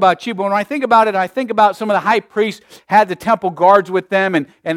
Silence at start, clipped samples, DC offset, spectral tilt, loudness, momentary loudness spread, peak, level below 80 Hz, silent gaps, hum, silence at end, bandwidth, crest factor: 0 s; under 0.1%; under 0.1%; -5.5 dB/octave; -15 LUFS; 8 LU; 0 dBFS; -60 dBFS; none; none; 0 s; 15.5 kHz; 14 dB